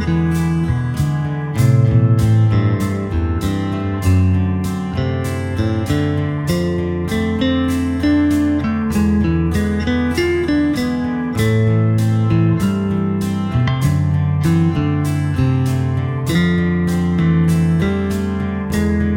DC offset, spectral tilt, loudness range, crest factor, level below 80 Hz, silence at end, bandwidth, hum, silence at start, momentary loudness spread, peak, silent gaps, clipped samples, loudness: under 0.1%; -7.5 dB/octave; 2 LU; 14 dB; -32 dBFS; 0 s; 16.5 kHz; none; 0 s; 6 LU; -2 dBFS; none; under 0.1%; -17 LUFS